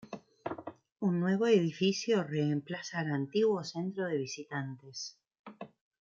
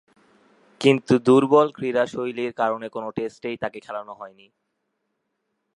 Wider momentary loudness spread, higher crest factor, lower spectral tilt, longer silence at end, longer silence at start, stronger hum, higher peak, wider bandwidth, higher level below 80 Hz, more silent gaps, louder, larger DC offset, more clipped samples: about the same, 19 LU vs 17 LU; about the same, 18 dB vs 22 dB; about the same, -6 dB/octave vs -6.5 dB/octave; second, 0.35 s vs 1.45 s; second, 0.05 s vs 0.8 s; neither; second, -14 dBFS vs -2 dBFS; second, 7.6 kHz vs 11 kHz; second, -78 dBFS vs -66 dBFS; first, 0.92-0.96 s, 5.39-5.44 s vs none; second, -33 LUFS vs -22 LUFS; neither; neither